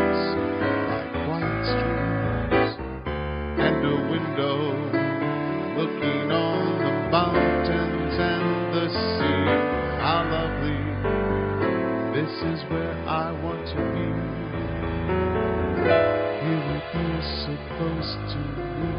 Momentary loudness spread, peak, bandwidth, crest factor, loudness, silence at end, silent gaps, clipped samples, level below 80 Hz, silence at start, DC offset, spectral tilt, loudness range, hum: 7 LU; -6 dBFS; 5.4 kHz; 18 dB; -25 LUFS; 0 s; none; under 0.1%; -40 dBFS; 0 s; under 0.1%; -10.5 dB/octave; 3 LU; none